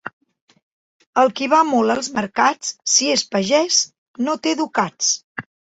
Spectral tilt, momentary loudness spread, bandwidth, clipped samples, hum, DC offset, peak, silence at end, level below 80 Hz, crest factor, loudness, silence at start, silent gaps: -2 dB/octave; 10 LU; 8 kHz; under 0.1%; none; under 0.1%; -2 dBFS; 0.4 s; -64 dBFS; 18 dB; -18 LUFS; 0.05 s; 0.13-0.21 s, 0.41-0.48 s, 0.62-1.00 s, 1.07-1.13 s, 3.98-4.14 s, 5.24-5.35 s